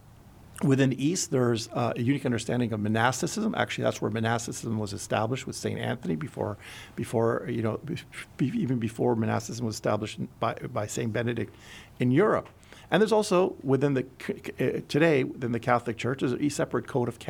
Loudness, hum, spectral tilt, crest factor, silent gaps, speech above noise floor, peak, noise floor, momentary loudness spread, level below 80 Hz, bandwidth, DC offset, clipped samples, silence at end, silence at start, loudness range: -28 LUFS; none; -5.5 dB/octave; 22 dB; none; 24 dB; -6 dBFS; -51 dBFS; 11 LU; -60 dBFS; 17 kHz; under 0.1%; under 0.1%; 0 s; 0.5 s; 4 LU